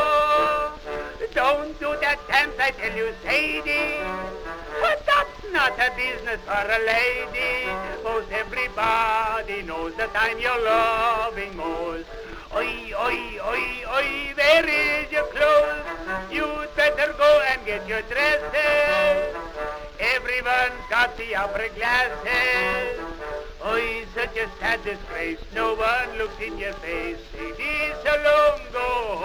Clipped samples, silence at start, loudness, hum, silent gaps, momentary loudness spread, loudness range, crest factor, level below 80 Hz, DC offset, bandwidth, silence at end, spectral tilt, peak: under 0.1%; 0 s; -23 LUFS; none; none; 11 LU; 5 LU; 20 dB; -42 dBFS; under 0.1%; over 20 kHz; 0 s; -3.5 dB/octave; -4 dBFS